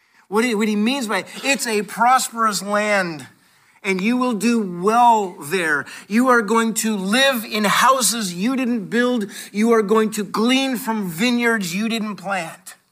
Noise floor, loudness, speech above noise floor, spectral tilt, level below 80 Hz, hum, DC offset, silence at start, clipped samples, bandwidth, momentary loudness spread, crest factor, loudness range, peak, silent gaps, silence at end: -55 dBFS; -19 LUFS; 36 dB; -3.5 dB/octave; -72 dBFS; none; under 0.1%; 0.3 s; under 0.1%; 16 kHz; 9 LU; 14 dB; 2 LU; -4 dBFS; none; 0.2 s